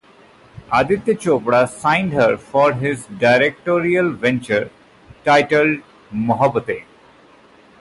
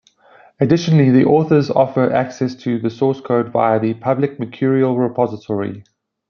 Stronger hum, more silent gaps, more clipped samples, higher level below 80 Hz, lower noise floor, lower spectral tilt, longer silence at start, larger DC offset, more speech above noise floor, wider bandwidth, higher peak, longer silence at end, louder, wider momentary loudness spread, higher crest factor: neither; neither; neither; first, -52 dBFS vs -58 dBFS; about the same, -48 dBFS vs -49 dBFS; second, -6 dB/octave vs -8 dB/octave; about the same, 0.55 s vs 0.6 s; neither; about the same, 32 dB vs 33 dB; first, 11.5 kHz vs 6.8 kHz; about the same, -4 dBFS vs -2 dBFS; first, 1 s vs 0.5 s; about the same, -17 LUFS vs -16 LUFS; about the same, 10 LU vs 9 LU; about the same, 16 dB vs 14 dB